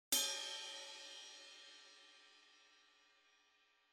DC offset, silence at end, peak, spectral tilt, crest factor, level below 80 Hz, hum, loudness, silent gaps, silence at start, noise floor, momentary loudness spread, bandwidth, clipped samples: under 0.1%; 1.1 s; -20 dBFS; 3 dB/octave; 28 dB; -86 dBFS; none; -43 LUFS; none; 0.1 s; -76 dBFS; 27 LU; 16 kHz; under 0.1%